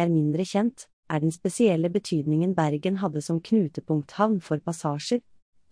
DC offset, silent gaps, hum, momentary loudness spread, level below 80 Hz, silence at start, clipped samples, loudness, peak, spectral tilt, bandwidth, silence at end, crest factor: under 0.1%; 0.93-1.03 s; none; 6 LU; -68 dBFS; 0 s; under 0.1%; -26 LUFS; -8 dBFS; -6.5 dB/octave; 10.5 kHz; 0.5 s; 16 dB